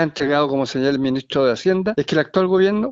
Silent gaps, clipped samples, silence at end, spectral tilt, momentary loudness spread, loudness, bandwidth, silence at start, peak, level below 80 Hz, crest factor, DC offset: none; under 0.1%; 0 s; -6 dB/octave; 4 LU; -19 LUFS; 7.8 kHz; 0 s; -4 dBFS; -54 dBFS; 14 dB; under 0.1%